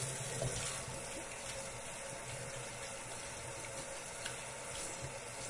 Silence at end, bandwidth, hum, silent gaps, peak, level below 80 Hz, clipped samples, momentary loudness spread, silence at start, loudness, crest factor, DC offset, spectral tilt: 0 s; 11.5 kHz; none; none; -24 dBFS; -60 dBFS; under 0.1%; 5 LU; 0 s; -43 LUFS; 20 dB; under 0.1%; -2.5 dB/octave